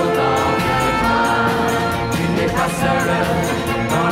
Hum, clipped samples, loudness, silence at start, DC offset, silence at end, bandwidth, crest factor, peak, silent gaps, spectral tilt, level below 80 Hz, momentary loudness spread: none; under 0.1%; -17 LUFS; 0 s; under 0.1%; 0 s; 16 kHz; 14 dB; -4 dBFS; none; -5 dB/octave; -36 dBFS; 3 LU